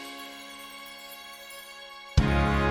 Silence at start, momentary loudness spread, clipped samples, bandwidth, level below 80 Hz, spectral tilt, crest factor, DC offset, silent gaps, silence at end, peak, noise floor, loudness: 0 s; 17 LU; under 0.1%; 17.5 kHz; -34 dBFS; -6 dB/octave; 22 dB; under 0.1%; none; 0 s; -8 dBFS; -45 dBFS; -27 LUFS